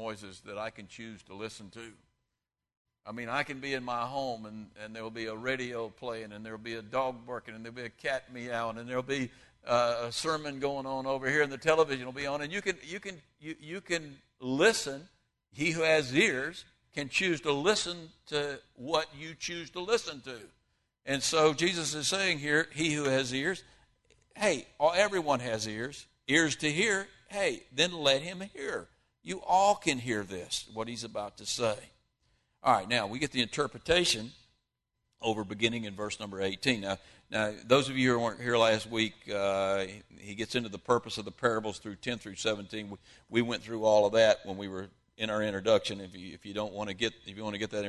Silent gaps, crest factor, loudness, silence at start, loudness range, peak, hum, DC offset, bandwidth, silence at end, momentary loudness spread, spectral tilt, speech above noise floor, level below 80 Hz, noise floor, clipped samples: 2.77-2.85 s; 22 dB; -31 LUFS; 0 s; 8 LU; -10 dBFS; none; under 0.1%; 12.5 kHz; 0 s; 16 LU; -3.5 dB/octave; 56 dB; -64 dBFS; -87 dBFS; under 0.1%